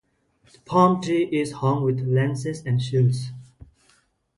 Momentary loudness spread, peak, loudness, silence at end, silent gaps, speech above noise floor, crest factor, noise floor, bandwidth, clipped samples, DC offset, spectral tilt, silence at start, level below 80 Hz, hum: 10 LU; -4 dBFS; -22 LUFS; 0.75 s; none; 41 dB; 20 dB; -63 dBFS; 11.5 kHz; under 0.1%; under 0.1%; -7.5 dB/octave; 0.7 s; -58 dBFS; none